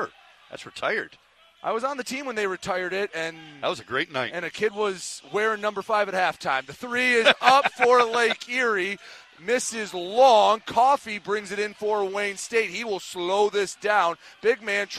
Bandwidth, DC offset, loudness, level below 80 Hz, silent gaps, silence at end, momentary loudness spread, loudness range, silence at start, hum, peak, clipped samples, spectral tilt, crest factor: 14 kHz; under 0.1%; -24 LUFS; -68 dBFS; none; 0 s; 12 LU; 8 LU; 0 s; none; 0 dBFS; under 0.1%; -2.5 dB/octave; 24 dB